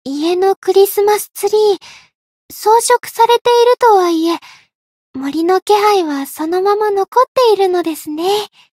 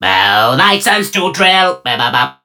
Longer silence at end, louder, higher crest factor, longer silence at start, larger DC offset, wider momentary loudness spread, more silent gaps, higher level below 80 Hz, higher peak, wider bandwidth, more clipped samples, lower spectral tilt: first, 0.3 s vs 0.1 s; second, -13 LUFS vs -10 LUFS; about the same, 12 dB vs 12 dB; about the same, 0.05 s vs 0 s; neither; first, 10 LU vs 4 LU; first, 0.56-0.62 s, 2.15-2.49 s, 3.41-3.45 s, 4.75-5.14 s, 5.62-5.66 s, 7.28-7.35 s vs none; second, -64 dBFS vs -58 dBFS; about the same, 0 dBFS vs 0 dBFS; second, 16.5 kHz vs over 20 kHz; neither; about the same, -2 dB/octave vs -2.5 dB/octave